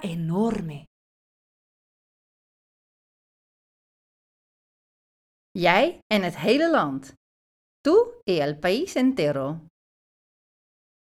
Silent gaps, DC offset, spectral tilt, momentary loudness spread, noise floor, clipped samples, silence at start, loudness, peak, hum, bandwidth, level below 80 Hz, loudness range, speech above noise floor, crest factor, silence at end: 0.87-5.55 s, 6.02-6.10 s, 7.17-7.84 s, 8.23-8.27 s; under 0.1%; -6 dB/octave; 14 LU; under -90 dBFS; under 0.1%; 0 s; -23 LUFS; -4 dBFS; none; 15 kHz; -60 dBFS; 10 LU; over 67 dB; 22 dB; 1.45 s